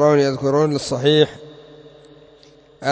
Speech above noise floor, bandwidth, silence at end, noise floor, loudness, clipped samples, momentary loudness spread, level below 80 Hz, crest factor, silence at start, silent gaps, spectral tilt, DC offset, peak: 32 dB; 8 kHz; 0 s; -49 dBFS; -18 LUFS; under 0.1%; 9 LU; -56 dBFS; 18 dB; 0 s; none; -5.5 dB/octave; under 0.1%; -2 dBFS